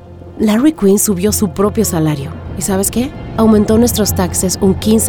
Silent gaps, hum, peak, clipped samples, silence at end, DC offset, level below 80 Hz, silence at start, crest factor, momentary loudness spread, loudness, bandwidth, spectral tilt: none; none; 0 dBFS; under 0.1%; 0 s; under 0.1%; -32 dBFS; 0 s; 12 dB; 8 LU; -13 LUFS; over 20 kHz; -5 dB/octave